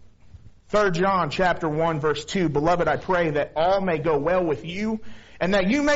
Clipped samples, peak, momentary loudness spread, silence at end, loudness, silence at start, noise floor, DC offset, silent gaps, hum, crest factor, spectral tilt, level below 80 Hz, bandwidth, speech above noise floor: under 0.1%; -8 dBFS; 6 LU; 0 s; -23 LUFS; 0.05 s; -46 dBFS; under 0.1%; none; none; 16 dB; -4.5 dB/octave; -46 dBFS; 8 kHz; 24 dB